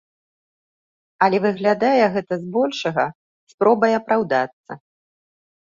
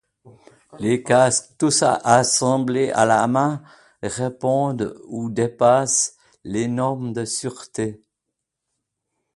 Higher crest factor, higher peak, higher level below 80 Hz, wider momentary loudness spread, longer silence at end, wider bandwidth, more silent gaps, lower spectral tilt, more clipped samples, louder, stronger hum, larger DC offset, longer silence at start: about the same, 20 dB vs 20 dB; about the same, -2 dBFS vs 0 dBFS; second, -66 dBFS vs -58 dBFS; about the same, 11 LU vs 12 LU; second, 1 s vs 1.4 s; second, 7.6 kHz vs 11.5 kHz; first, 3.15-3.47 s, 3.54-3.58 s, 4.53-4.64 s vs none; first, -6 dB/octave vs -4 dB/octave; neither; about the same, -19 LUFS vs -20 LUFS; neither; neither; first, 1.2 s vs 0.25 s